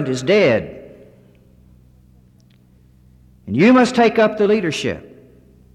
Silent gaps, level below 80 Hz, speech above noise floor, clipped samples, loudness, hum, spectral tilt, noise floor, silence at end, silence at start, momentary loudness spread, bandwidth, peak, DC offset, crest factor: none; -52 dBFS; 36 dB; under 0.1%; -15 LUFS; none; -5.5 dB/octave; -51 dBFS; 0.75 s; 0 s; 17 LU; 11.5 kHz; -4 dBFS; under 0.1%; 16 dB